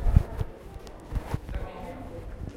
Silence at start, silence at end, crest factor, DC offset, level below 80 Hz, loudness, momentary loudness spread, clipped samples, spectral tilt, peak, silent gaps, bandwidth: 0 s; 0 s; 26 dB; under 0.1%; -32 dBFS; -34 LUFS; 17 LU; under 0.1%; -8 dB/octave; -4 dBFS; none; 14 kHz